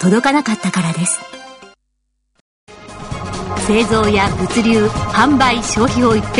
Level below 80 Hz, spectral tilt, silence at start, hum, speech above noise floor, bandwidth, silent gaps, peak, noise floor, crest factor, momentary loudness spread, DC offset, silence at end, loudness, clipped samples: -34 dBFS; -4.5 dB/octave; 0 s; none; 54 dB; 11 kHz; 2.41-2.67 s; 0 dBFS; -68 dBFS; 14 dB; 15 LU; under 0.1%; 0 s; -15 LUFS; under 0.1%